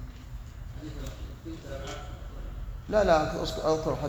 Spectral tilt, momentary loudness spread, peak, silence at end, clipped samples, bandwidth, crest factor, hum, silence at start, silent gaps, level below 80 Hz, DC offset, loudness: -5.5 dB/octave; 19 LU; -10 dBFS; 0 s; under 0.1%; over 20 kHz; 20 dB; none; 0 s; none; -40 dBFS; under 0.1%; -30 LUFS